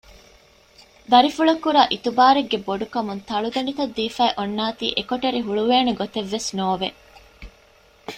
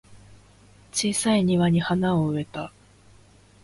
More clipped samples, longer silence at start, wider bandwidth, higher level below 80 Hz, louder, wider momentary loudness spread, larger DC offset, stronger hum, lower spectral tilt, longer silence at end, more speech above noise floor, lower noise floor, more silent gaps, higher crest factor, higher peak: neither; first, 1.1 s vs 0.1 s; first, 15.5 kHz vs 11.5 kHz; about the same, -54 dBFS vs -54 dBFS; about the same, -21 LUFS vs -23 LUFS; second, 10 LU vs 14 LU; neither; second, none vs 50 Hz at -45 dBFS; about the same, -4 dB/octave vs -5 dB/octave; second, 0 s vs 0.95 s; about the same, 33 dB vs 31 dB; about the same, -54 dBFS vs -54 dBFS; neither; about the same, 20 dB vs 16 dB; first, -2 dBFS vs -10 dBFS